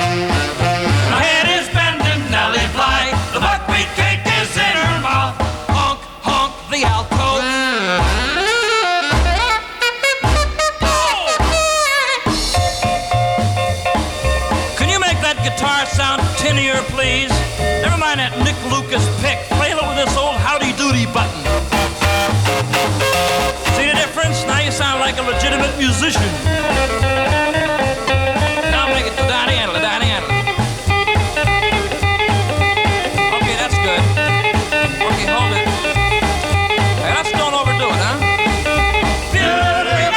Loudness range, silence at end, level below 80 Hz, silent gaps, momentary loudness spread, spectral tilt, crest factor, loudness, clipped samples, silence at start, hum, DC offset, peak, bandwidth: 1 LU; 0 s; -28 dBFS; none; 3 LU; -4 dB/octave; 10 dB; -15 LUFS; under 0.1%; 0 s; none; under 0.1%; -6 dBFS; 18.5 kHz